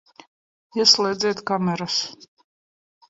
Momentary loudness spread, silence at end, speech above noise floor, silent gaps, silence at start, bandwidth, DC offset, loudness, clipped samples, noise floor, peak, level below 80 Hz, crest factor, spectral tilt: 12 LU; 0.95 s; over 68 dB; none; 0.75 s; 8 kHz; under 0.1%; -20 LUFS; under 0.1%; under -90 dBFS; -2 dBFS; -68 dBFS; 22 dB; -3 dB/octave